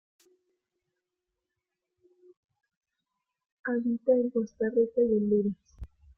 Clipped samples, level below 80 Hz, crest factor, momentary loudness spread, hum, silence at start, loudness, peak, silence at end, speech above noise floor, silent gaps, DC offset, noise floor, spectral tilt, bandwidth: under 0.1%; -60 dBFS; 18 dB; 8 LU; none; 3.65 s; -28 LUFS; -14 dBFS; 0.3 s; 60 dB; none; under 0.1%; -86 dBFS; -10 dB/octave; 6.2 kHz